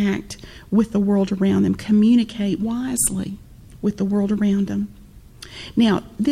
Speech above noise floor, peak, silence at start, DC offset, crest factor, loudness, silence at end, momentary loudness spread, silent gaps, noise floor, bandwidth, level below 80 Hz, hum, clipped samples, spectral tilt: 23 dB; -6 dBFS; 0 s; under 0.1%; 14 dB; -20 LUFS; 0 s; 15 LU; none; -42 dBFS; 15.5 kHz; -46 dBFS; none; under 0.1%; -5.5 dB/octave